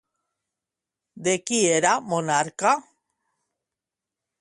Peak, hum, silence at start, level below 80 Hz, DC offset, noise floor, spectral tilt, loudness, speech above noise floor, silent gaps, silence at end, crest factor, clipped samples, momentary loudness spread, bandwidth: -6 dBFS; none; 1.15 s; -72 dBFS; under 0.1%; -88 dBFS; -3 dB/octave; -22 LUFS; 66 dB; none; 1.6 s; 20 dB; under 0.1%; 6 LU; 11.5 kHz